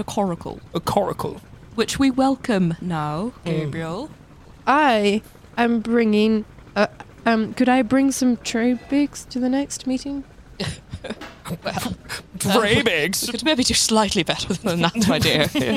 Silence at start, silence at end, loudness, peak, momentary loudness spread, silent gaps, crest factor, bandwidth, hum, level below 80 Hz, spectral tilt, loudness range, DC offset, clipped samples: 0 s; 0 s; -21 LUFS; -2 dBFS; 14 LU; none; 18 dB; 16 kHz; none; -46 dBFS; -4 dB/octave; 6 LU; under 0.1%; under 0.1%